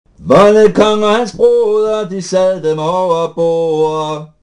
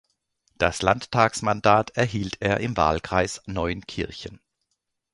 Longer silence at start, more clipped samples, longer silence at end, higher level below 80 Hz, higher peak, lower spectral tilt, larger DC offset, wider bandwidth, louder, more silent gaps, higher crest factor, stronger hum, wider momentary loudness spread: second, 0.2 s vs 0.6 s; first, 0.9% vs under 0.1%; second, 0.15 s vs 0.8 s; about the same, -46 dBFS vs -44 dBFS; about the same, 0 dBFS vs -2 dBFS; about the same, -5.5 dB/octave vs -5 dB/octave; neither; about the same, 10.5 kHz vs 11.5 kHz; first, -12 LUFS vs -24 LUFS; neither; second, 12 dB vs 22 dB; neither; second, 8 LU vs 12 LU